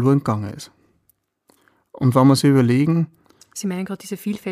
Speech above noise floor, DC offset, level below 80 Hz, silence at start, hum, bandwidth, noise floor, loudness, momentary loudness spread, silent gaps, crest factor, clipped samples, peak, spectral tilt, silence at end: 47 dB; under 0.1%; -60 dBFS; 0 s; none; 15.5 kHz; -65 dBFS; -19 LUFS; 18 LU; none; 18 dB; under 0.1%; -2 dBFS; -7 dB/octave; 0 s